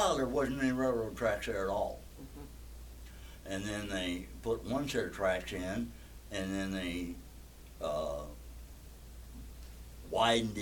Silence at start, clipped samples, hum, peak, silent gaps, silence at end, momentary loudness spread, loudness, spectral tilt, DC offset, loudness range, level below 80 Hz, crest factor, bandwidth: 0 s; under 0.1%; none; -16 dBFS; none; 0 s; 20 LU; -35 LUFS; -4.5 dB/octave; under 0.1%; 5 LU; -50 dBFS; 20 dB; 18 kHz